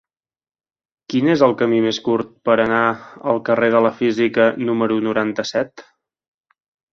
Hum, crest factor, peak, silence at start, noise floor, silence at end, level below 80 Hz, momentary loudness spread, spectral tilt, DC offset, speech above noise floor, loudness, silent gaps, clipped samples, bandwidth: none; 18 dB; 0 dBFS; 1.1 s; under -90 dBFS; 1.1 s; -60 dBFS; 7 LU; -6 dB/octave; under 0.1%; over 73 dB; -18 LUFS; none; under 0.1%; 7.2 kHz